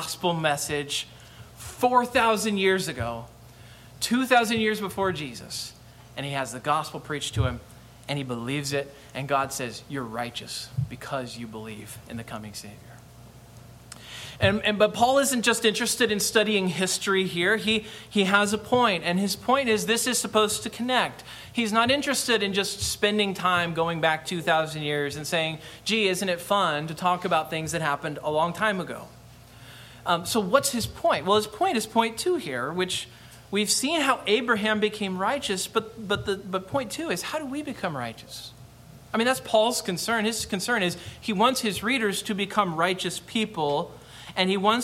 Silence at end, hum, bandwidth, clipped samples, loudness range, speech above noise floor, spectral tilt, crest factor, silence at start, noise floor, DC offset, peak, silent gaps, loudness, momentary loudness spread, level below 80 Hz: 0 s; none; 16.5 kHz; under 0.1%; 8 LU; 22 dB; -3.5 dB/octave; 22 dB; 0 s; -48 dBFS; under 0.1%; -4 dBFS; none; -25 LUFS; 14 LU; -54 dBFS